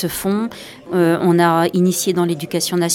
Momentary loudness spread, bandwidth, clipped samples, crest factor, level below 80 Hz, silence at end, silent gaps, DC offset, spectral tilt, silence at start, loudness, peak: 9 LU; 17.5 kHz; under 0.1%; 14 dB; -54 dBFS; 0 s; none; under 0.1%; -5 dB/octave; 0 s; -17 LUFS; -4 dBFS